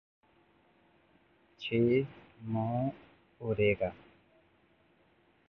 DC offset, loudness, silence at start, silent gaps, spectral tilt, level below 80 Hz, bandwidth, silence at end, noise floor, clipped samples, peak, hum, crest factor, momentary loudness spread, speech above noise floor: under 0.1%; -33 LUFS; 1.6 s; none; -9 dB/octave; -62 dBFS; 6.2 kHz; 1.55 s; -68 dBFS; under 0.1%; -16 dBFS; none; 20 dB; 14 LU; 37 dB